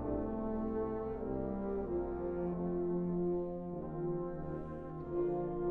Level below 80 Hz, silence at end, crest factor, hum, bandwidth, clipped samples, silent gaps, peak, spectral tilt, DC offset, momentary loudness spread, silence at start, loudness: -50 dBFS; 0 s; 12 dB; none; 3 kHz; under 0.1%; none; -26 dBFS; -12 dB/octave; under 0.1%; 6 LU; 0 s; -38 LUFS